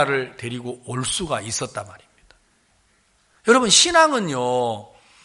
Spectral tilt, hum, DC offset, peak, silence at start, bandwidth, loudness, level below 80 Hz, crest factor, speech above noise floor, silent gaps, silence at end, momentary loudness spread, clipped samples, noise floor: -2.5 dB/octave; none; under 0.1%; 0 dBFS; 0 s; 11.5 kHz; -19 LUFS; -54 dBFS; 22 dB; 41 dB; none; 0.4 s; 18 LU; under 0.1%; -62 dBFS